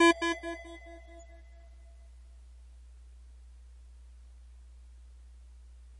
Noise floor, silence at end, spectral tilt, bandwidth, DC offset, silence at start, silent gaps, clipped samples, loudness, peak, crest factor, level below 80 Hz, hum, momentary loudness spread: -52 dBFS; 0 s; -3.5 dB/octave; 11 kHz; under 0.1%; 0 s; none; under 0.1%; -32 LUFS; -10 dBFS; 26 dB; -52 dBFS; none; 19 LU